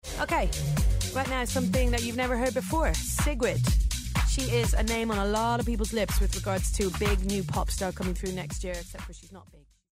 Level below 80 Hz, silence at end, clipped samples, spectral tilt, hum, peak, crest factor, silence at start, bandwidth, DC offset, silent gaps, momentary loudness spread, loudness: -32 dBFS; 0.35 s; under 0.1%; -4.5 dB/octave; none; -14 dBFS; 12 dB; 0.05 s; 16 kHz; under 0.1%; none; 7 LU; -28 LUFS